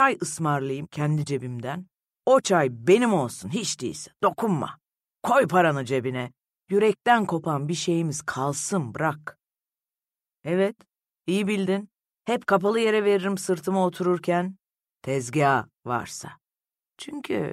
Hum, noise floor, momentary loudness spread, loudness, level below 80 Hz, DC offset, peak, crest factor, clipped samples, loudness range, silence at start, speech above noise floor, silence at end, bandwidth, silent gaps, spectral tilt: none; under -90 dBFS; 14 LU; -25 LUFS; -68 dBFS; under 0.1%; -6 dBFS; 18 dB; under 0.1%; 5 LU; 0 s; over 66 dB; 0 s; 15 kHz; none; -5 dB/octave